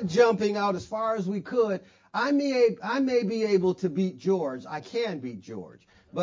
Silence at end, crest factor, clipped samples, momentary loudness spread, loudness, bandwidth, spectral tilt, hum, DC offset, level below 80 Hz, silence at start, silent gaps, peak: 0 s; 18 dB; under 0.1%; 14 LU; -27 LUFS; 7.6 kHz; -6.5 dB/octave; none; under 0.1%; -66 dBFS; 0 s; none; -8 dBFS